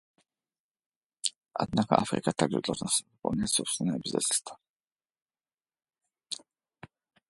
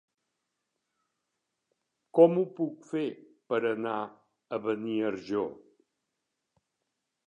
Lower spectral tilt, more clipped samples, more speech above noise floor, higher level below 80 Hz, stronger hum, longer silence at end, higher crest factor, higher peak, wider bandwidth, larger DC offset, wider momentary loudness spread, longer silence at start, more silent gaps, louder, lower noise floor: second, -3.5 dB/octave vs -8 dB/octave; neither; first, over 61 dB vs 56 dB; first, -62 dBFS vs -80 dBFS; neither; second, 0.9 s vs 1.75 s; about the same, 28 dB vs 26 dB; first, -4 dBFS vs -8 dBFS; first, 12 kHz vs 7.4 kHz; neither; about the same, 14 LU vs 14 LU; second, 1.25 s vs 2.15 s; first, 1.36-1.41 s, 4.70-4.80 s, 5.22-5.26 s vs none; about the same, -30 LUFS vs -30 LUFS; first, under -90 dBFS vs -84 dBFS